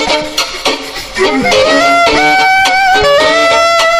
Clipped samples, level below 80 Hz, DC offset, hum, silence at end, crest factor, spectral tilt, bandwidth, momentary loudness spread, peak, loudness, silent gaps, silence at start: under 0.1%; -34 dBFS; under 0.1%; none; 0 s; 10 dB; -2 dB/octave; 15.5 kHz; 7 LU; 0 dBFS; -8 LUFS; none; 0 s